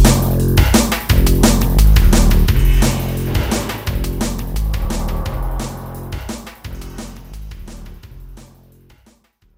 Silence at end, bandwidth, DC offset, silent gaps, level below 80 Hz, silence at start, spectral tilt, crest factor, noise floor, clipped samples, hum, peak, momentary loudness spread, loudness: 1.15 s; 16.5 kHz; under 0.1%; none; -18 dBFS; 0 s; -5 dB/octave; 16 dB; -53 dBFS; under 0.1%; none; 0 dBFS; 21 LU; -16 LUFS